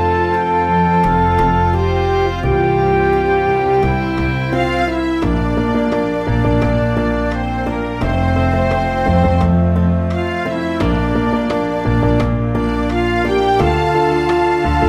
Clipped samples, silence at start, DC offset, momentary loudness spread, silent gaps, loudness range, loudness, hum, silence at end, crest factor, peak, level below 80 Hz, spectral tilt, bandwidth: under 0.1%; 0 s; under 0.1%; 4 LU; none; 2 LU; -16 LUFS; none; 0 s; 14 dB; -2 dBFS; -26 dBFS; -8 dB/octave; 11.5 kHz